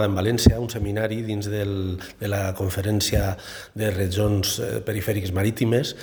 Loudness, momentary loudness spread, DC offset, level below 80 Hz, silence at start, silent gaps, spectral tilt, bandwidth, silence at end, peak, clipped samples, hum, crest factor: -24 LUFS; 9 LU; under 0.1%; -36 dBFS; 0 s; none; -5.5 dB/octave; over 20 kHz; 0 s; 0 dBFS; under 0.1%; none; 22 dB